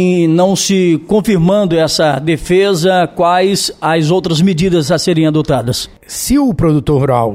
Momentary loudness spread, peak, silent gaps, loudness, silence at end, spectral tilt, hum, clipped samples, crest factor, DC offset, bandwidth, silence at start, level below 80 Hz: 4 LU; 0 dBFS; none; -12 LUFS; 0 s; -5.5 dB/octave; none; under 0.1%; 10 dB; under 0.1%; 16 kHz; 0 s; -34 dBFS